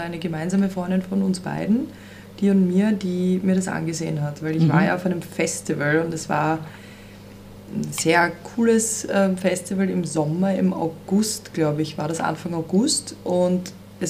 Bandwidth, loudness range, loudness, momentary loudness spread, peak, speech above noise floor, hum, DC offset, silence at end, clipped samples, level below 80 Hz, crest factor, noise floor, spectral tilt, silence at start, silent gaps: 15.5 kHz; 2 LU; -22 LUFS; 10 LU; -4 dBFS; 20 dB; 50 Hz at -45 dBFS; under 0.1%; 0 s; under 0.1%; -56 dBFS; 18 dB; -42 dBFS; -5.5 dB/octave; 0 s; none